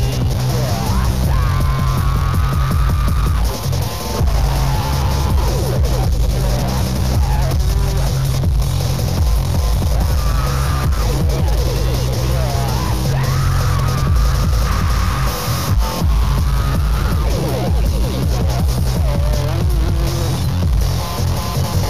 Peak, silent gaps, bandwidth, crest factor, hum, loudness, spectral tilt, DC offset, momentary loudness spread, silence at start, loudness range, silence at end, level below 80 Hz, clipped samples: -4 dBFS; none; 15.5 kHz; 12 dB; none; -18 LUFS; -5.5 dB/octave; 3%; 2 LU; 0 s; 1 LU; 0 s; -18 dBFS; under 0.1%